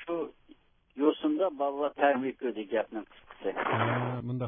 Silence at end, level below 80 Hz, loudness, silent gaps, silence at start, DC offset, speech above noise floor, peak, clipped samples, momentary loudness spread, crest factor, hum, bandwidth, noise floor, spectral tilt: 0 s; -68 dBFS; -31 LUFS; none; 0 s; under 0.1%; 29 dB; -10 dBFS; under 0.1%; 12 LU; 20 dB; none; 3.8 kHz; -60 dBFS; -10.5 dB/octave